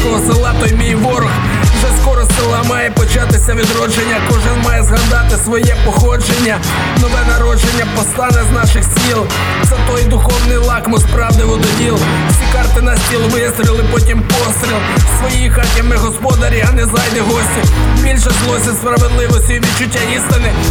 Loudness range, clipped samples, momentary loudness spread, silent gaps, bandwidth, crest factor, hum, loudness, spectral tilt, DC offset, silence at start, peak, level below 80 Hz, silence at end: 0 LU; under 0.1%; 2 LU; none; 18 kHz; 10 dB; none; -11 LUFS; -4.5 dB/octave; under 0.1%; 0 s; 0 dBFS; -14 dBFS; 0 s